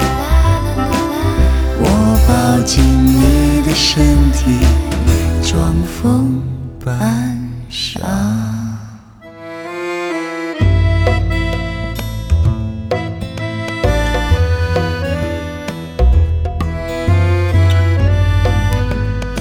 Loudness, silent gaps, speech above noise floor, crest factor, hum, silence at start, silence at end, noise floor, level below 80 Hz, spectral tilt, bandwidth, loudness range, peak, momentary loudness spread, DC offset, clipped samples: -15 LUFS; none; 24 dB; 12 dB; none; 0 s; 0 s; -36 dBFS; -18 dBFS; -6 dB/octave; over 20 kHz; 7 LU; 0 dBFS; 11 LU; under 0.1%; under 0.1%